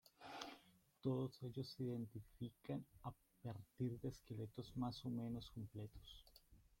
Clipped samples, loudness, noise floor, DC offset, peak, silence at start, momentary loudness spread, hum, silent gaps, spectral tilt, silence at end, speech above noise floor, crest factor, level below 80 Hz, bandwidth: under 0.1%; -50 LUFS; -71 dBFS; under 0.1%; -30 dBFS; 0.2 s; 11 LU; none; none; -7 dB/octave; 0.2 s; 22 dB; 20 dB; -70 dBFS; 16.5 kHz